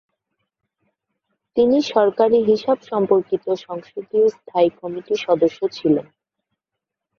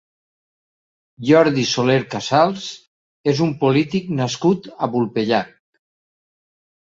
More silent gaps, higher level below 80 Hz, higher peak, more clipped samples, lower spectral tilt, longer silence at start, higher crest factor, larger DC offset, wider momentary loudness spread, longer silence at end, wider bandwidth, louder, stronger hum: second, none vs 2.87-3.24 s; about the same, -64 dBFS vs -60 dBFS; about the same, -2 dBFS vs -2 dBFS; neither; about the same, -6.5 dB/octave vs -5.5 dB/octave; first, 1.55 s vs 1.2 s; about the same, 18 dB vs 18 dB; neither; about the same, 9 LU vs 10 LU; second, 1.2 s vs 1.35 s; second, 7 kHz vs 7.8 kHz; about the same, -19 LUFS vs -18 LUFS; neither